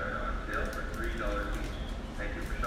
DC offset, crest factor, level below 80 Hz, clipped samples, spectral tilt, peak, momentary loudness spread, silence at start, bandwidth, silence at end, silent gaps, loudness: under 0.1%; 14 dB; -36 dBFS; under 0.1%; -5.5 dB/octave; -20 dBFS; 5 LU; 0 s; 15.5 kHz; 0 s; none; -36 LUFS